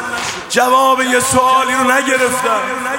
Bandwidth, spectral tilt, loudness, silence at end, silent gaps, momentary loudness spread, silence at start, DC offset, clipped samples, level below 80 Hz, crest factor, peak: 16.5 kHz; -2 dB/octave; -13 LUFS; 0 s; none; 6 LU; 0 s; under 0.1%; under 0.1%; -50 dBFS; 14 dB; 0 dBFS